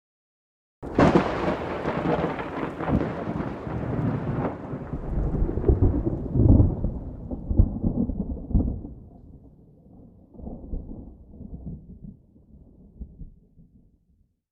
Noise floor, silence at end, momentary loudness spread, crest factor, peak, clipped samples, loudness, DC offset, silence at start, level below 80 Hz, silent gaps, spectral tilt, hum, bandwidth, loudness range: -65 dBFS; 0.9 s; 23 LU; 22 dB; -6 dBFS; under 0.1%; -26 LUFS; under 0.1%; 0.8 s; -32 dBFS; none; -9 dB/octave; none; 7.8 kHz; 18 LU